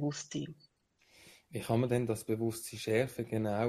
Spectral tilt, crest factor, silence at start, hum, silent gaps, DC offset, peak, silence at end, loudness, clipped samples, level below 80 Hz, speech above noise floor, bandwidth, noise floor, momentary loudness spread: -6 dB/octave; 20 dB; 0 s; none; none; under 0.1%; -16 dBFS; 0 s; -35 LUFS; under 0.1%; -68 dBFS; 35 dB; 15.5 kHz; -69 dBFS; 11 LU